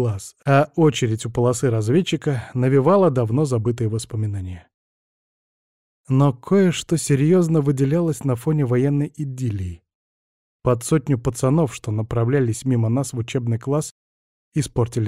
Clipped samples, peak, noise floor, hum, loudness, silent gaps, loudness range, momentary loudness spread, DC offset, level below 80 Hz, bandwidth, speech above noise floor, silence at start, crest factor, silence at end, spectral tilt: under 0.1%; -6 dBFS; under -90 dBFS; none; -20 LUFS; 4.74-6.04 s, 9.95-10.59 s, 13.91-14.52 s; 4 LU; 9 LU; 0.2%; -50 dBFS; 14.5 kHz; over 71 dB; 0 s; 14 dB; 0 s; -7 dB/octave